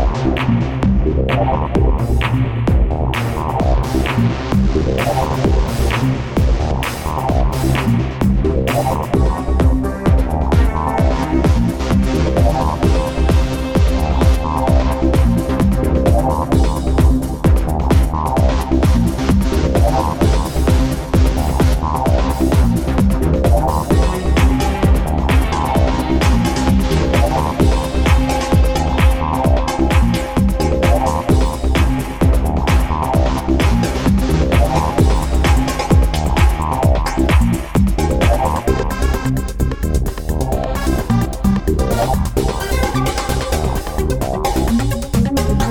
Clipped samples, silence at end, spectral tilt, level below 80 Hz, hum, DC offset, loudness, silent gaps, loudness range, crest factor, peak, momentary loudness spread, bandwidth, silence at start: under 0.1%; 0 s; -6.5 dB/octave; -18 dBFS; none; under 0.1%; -16 LUFS; none; 3 LU; 14 dB; -2 dBFS; 4 LU; 16.5 kHz; 0 s